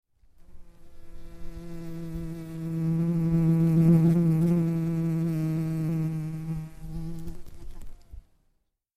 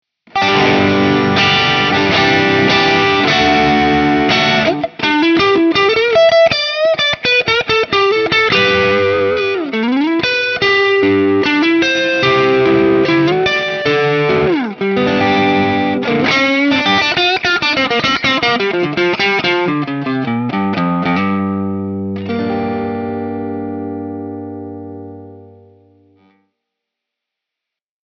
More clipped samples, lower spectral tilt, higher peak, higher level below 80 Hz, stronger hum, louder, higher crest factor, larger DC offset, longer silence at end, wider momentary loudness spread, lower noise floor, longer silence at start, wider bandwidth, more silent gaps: neither; first, -9.5 dB/octave vs -5 dB/octave; second, -10 dBFS vs 0 dBFS; about the same, -44 dBFS vs -46 dBFS; second, none vs 50 Hz at -45 dBFS; second, -26 LUFS vs -13 LUFS; about the same, 16 dB vs 14 dB; neither; second, 0.75 s vs 2.55 s; first, 20 LU vs 10 LU; second, -72 dBFS vs -82 dBFS; first, 0.5 s vs 0.35 s; second, 5.6 kHz vs 7 kHz; neither